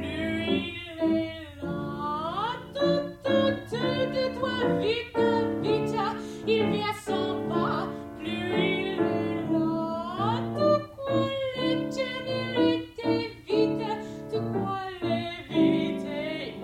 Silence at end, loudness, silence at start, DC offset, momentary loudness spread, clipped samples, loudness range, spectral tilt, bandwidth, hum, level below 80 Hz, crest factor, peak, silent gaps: 0 s; -28 LUFS; 0 s; under 0.1%; 7 LU; under 0.1%; 2 LU; -6.5 dB/octave; 13.5 kHz; none; -58 dBFS; 16 dB; -10 dBFS; none